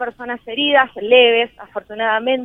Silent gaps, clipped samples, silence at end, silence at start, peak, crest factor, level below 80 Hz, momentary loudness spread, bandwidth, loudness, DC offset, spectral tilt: none; under 0.1%; 0 s; 0 s; 0 dBFS; 16 dB; -58 dBFS; 17 LU; 3.9 kHz; -15 LUFS; under 0.1%; -5.5 dB/octave